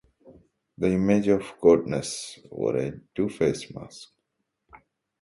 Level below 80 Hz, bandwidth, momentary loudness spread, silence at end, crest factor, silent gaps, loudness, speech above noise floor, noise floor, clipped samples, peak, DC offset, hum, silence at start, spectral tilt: -56 dBFS; 11.5 kHz; 19 LU; 0.45 s; 20 dB; none; -25 LUFS; 54 dB; -79 dBFS; under 0.1%; -6 dBFS; under 0.1%; none; 0.8 s; -6 dB/octave